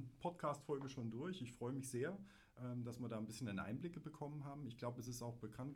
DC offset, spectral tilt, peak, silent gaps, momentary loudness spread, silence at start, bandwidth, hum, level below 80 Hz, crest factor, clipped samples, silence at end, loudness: under 0.1%; -6 dB/octave; -30 dBFS; none; 6 LU; 0 s; 16.5 kHz; none; -74 dBFS; 18 dB; under 0.1%; 0 s; -48 LUFS